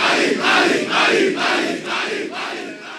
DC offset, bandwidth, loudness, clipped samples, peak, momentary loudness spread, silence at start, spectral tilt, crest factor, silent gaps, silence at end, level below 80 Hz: under 0.1%; 13.5 kHz; -17 LUFS; under 0.1%; -4 dBFS; 11 LU; 0 s; -2.5 dB/octave; 16 dB; none; 0 s; -68 dBFS